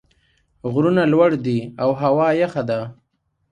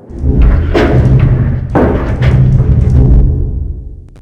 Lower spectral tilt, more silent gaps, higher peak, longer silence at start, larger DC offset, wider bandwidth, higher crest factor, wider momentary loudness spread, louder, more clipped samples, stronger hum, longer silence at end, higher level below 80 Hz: about the same, -8.5 dB/octave vs -9.5 dB/octave; neither; about the same, -2 dBFS vs 0 dBFS; first, 0.65 s vs 0.1 s; neither; first, 9.6 kHz vs 6 kHz; first, 18 dB vs 8 dB; about the same, 10 LU vs 8 LU; second, -19 LUFS vs -10 LUFS; second, under 0.1% vs 1%; neither; first, 0.6 s vs 0.2 s; second, -56 dBFS vs -12 dBFS